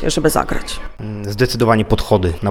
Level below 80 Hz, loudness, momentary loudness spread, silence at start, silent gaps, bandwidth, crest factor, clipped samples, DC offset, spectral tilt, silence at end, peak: -28 dBFS; -17 LUFS; 14 LU; 0 s; none; 18.5 kHz; 16 dB; under 0.1%; under 0.1%; -5.5 dB/octave; 0 s; 0 dBFS